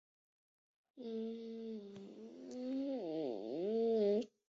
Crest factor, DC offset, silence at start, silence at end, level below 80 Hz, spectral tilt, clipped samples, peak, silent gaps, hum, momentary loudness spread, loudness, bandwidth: 16 dB; under 0.1%; 0.95 s; 0.2 s; -86 dBFS; -6.5 dB/octave; under 0.1%; -26 dBFS; none; none; 18 LU; -40 LUFS; 7.4 kHz